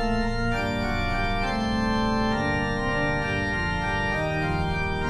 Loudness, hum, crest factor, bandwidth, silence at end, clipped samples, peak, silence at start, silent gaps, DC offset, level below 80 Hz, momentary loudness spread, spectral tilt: -25 LUFS; none; 12 dB; 12.5 kHz; 0 s; under 0.1%; -12 dBFS; 0 s; none; under 0.1%; -34 dBFS; 2 LU; -6 dB/octave